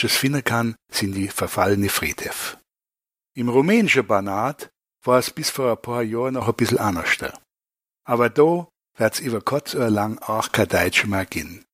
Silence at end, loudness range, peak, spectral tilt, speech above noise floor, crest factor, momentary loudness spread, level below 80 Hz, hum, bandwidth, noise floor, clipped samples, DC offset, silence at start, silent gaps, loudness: 0.15 s; 2 LU; -2 dBFS; -4.5 dB/octave; over 69 dB; 20 dB; 10 LU; -52 dBFS; none; 16 kHz; under -90 dBFS; under 0.1%; under 0.1%; 0 s; none; -21 LUFS